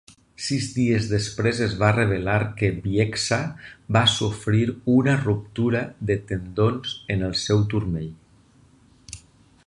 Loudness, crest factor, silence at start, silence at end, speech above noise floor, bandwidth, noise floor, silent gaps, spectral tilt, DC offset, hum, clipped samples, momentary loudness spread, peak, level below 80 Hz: -23 LUFS; 20 dB; 0.4 s; 0.5 s; 33 dB; 11 kHz; -55 dBFS; none; -5.5 dB/octave; under 0.1%; none; under 0.1%; 11 LU; -2 dBFS; -46 dBFS